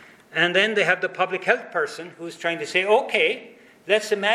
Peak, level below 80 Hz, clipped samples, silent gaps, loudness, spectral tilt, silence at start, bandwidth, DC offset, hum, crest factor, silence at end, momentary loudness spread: -2 dBFS; -78 dBFS; under 0.1%; none; -22 LUFS; -3 dB/octave; 0.3 s; 14 kHz; under 0.1%; none; 20 dB; 0 s; 11 LU